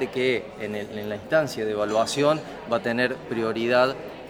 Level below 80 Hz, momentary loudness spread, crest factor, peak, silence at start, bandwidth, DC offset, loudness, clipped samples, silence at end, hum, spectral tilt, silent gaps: -58 dBFS; 10 LU; 18 dB; -6 dBFS; 0 s; 17 kHz; under 0.1%; -25 LUFS; under 0.1%; 0 s; none; -4.5 dB/octave; none